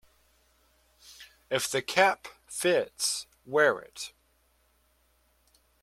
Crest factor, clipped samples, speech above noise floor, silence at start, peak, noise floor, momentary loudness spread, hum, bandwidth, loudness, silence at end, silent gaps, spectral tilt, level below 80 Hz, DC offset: 24 dB; under 0.1%; 41 dB; 1.1 s; -6 dBFS; -69 dBFS; 17 LU; none; 16 kHz; -28 LUFS; 1.75 s; none; -2 dB/octave; -70 dBFS; under 0.1%